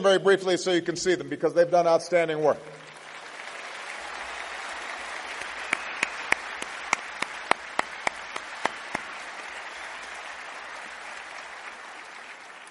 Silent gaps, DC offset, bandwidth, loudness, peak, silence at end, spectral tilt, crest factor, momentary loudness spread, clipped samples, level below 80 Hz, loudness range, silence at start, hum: none; under 0.1%; 11.5 kHz; -28 LUFS; -2 dBFS; 0 s; -3.5 dB/octave; 28 dB; 17 LU; under 0.1%; -68 dBFS; 11 LU; 0 s; none